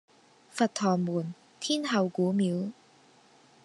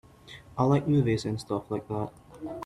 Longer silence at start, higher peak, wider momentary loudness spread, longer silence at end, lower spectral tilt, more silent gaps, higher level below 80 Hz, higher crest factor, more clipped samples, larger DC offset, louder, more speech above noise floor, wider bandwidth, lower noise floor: first, 0.55 s vs 0.25 s; about the same, -10 dBFS vs -10 dBFS; second, 11 LU vs 18 LU; first, 0.9 s vs 0 s; second, -5.5 dB/octave vs -7.5 dB/octave; neither; second, -82 dBFS vs -56 dBFS; about the same, 20 dB vs 18 dB; neither; neither; about the same, -29 LUFS vs -28 LUFS; first, 32 dB vs 23 dB; about the same, 11.5 kHz vs 12 kHz; first, -60 dBFS vs -50 dBFS